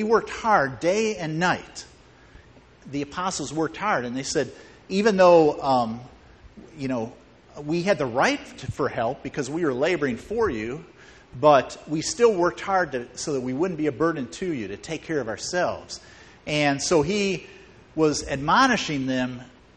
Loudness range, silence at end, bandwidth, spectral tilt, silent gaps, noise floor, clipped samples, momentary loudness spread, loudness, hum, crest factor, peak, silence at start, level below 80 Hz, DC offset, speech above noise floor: 5 LU; 0.3 s; 9.4 kHz; -4.5 dB/octave; none; -51 dBFS; under 0.1%; 15 LU; -24 LUFS; none; 20 dB; -4 dBFS; 0 s; -52 dBFS; under 0.1%; 27 dB